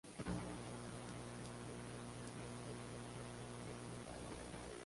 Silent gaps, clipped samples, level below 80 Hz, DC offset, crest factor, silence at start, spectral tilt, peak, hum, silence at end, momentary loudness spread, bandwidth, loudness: none; under 0.1%; -62 dBFS; under 0.1%; 18 dB; 0.05 s; -5 dB/octave; -32 dBFS; 60 Hz at -55 dBFS; 0 s; 4 LU; 11.5 kHz; -50 LUFS